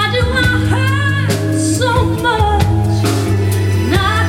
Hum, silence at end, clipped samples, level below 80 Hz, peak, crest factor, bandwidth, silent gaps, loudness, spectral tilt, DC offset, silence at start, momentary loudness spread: none; 0 s; under 0.1%; -26 dBFS; 0 dBFS; 12 dB; 15.5 kHz; none; -14 LUFS; -5.5 dB/octave; under 0.1%; 0 s; 2 LU